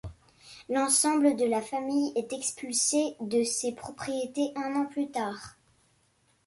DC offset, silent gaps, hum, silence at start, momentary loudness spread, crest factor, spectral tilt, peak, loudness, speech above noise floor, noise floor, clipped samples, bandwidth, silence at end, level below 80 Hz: under 0.1%; none; none; 0.05 s; 12 LU; 18 dB; -2.5 dB/octave; -10 dBFS; -28 LUFS; 40 dB; -69 dBFS; under 0.1%; 12 kHz; 0.95 s; -62 dBFS